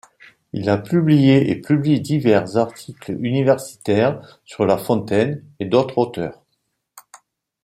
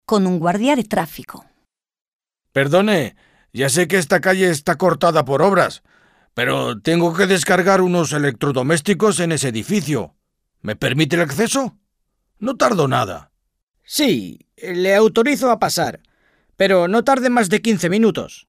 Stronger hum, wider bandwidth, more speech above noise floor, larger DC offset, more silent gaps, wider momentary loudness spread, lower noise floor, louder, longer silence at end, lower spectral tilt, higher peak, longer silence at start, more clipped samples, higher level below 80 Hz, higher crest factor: neither; about the same, 16 kHz vs 16 kHz; about the same, 54 dB vs 54 dB; neither; second, none vs 2.08-2.19 s, 13.63-13.67 s; first, 14 LU vs 11 LU; about the same, -72 dBFS vs -71 dBFS; about the same, -19 LUFS vs -17 LUFS; first, 0.65 s vs 0.1 s; first, -7.5 dB/octave vs -4.5 dB/octave; about the same, -2 dBFS vs -2 dBFS; first, 0.55 s vs 0.1 s; neither; about the same, -58 dBFS vs -54 dBFS; about the same, 16 dB vs 16 dB